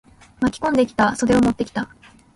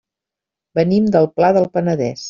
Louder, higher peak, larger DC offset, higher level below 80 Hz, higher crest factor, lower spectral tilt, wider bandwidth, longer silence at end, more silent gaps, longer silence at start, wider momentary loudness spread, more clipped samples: second, -20 LUFS vs -16 LUFS; about the same, -4 dBFS vs -2 dBFS; neither; first, -44 dBFS vs -56 dBFS; about the same, 16 dB vs 14 dB; second, -5.5 dB/octave vs -7 dB/octave; first, 11.5 kHz vs 7.4 kHz; first, 0.5 s vs 0 s; neither; second, 0.4 s vs 0.75 s; first, 10 LU vs 5 LU; neither